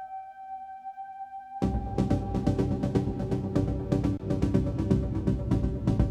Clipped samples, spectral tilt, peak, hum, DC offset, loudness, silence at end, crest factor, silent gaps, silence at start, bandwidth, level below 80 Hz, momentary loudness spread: under 0.1%; -9 dB/octave; -10 dBFS; none; under 0.1%; -29 LUFS; 0 s; 18 dB; none; 0 s; 10 kHz; -36 dBFS; 14 LU